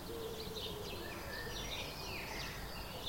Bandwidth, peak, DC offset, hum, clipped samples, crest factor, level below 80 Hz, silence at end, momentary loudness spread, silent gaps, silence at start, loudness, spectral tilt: 16.5 kHz; -30 dBFS; under 0.1%; none; under 0.1%; 14 dB; -54 dBFS; 0 s; 3 LU; none; 0 s; -43 LUFS; -3.5 dB/octave